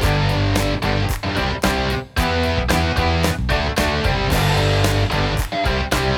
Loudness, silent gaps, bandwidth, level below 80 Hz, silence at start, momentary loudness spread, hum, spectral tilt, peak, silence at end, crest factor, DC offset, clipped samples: -19 LUFS; none; 18.5 kHz; -26 dBFS; 0 s; 4 LU; none; -5 dB/octave; -2 dBFS; 0 s; 16 dB; under 0.1%; under 0.1%